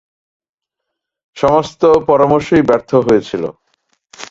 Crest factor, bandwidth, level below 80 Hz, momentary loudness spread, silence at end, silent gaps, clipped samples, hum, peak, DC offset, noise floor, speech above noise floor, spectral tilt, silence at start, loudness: 14 dB; 7.8 kHz; -46 dBFS; 11 LU; 0.05 s; none; under 0.1%; none; 0 dBFS; under 0.1%; -78 dBFS; 66 dB; -6.5 dB/octave; 1.35 s; -13 LUFS